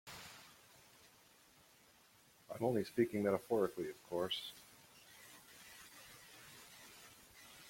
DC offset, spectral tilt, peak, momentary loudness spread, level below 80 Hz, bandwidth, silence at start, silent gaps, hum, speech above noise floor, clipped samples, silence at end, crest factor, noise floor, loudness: under 0.1%; -5 dB/octave; -22 dBFS; 24 LU; -78 dBFS; 16.5 kHz; 0.05 s; none; none; 30 dB; under 0.1%; 0 s; 22 dB; -68 dBFS; -40 LUFS